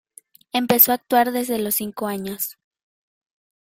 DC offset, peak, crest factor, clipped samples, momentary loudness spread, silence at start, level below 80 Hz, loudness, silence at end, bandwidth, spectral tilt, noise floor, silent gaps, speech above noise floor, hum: under 0.1%; 0 dBFS; 22 dB; under 0.1%; 13 LU; 0.55 s; -64 dBFS; -20 LUFS; 1.1 s; 16.5 kHz; -3.5 dB/octave; -51 dBFS; none; 31 dB; none